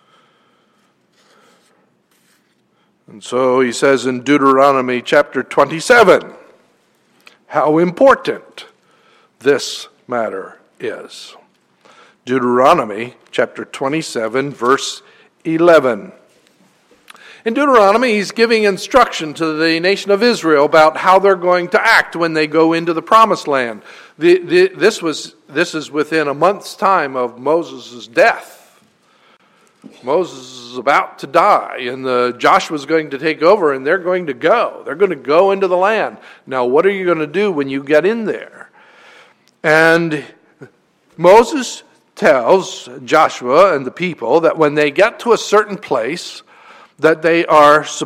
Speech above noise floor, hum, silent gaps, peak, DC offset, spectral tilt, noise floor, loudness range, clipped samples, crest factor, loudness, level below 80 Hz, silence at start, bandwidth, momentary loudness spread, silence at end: 45 dB; none; none; 0 dBFS; under 0.1%; -4.5 dB/octave; -59 dBFS; 6 LU; under 0.1%; 14 dB; -14 LUFS; -56 dBFS; 3.1 s; 16 kHz; 14 LU; 0 s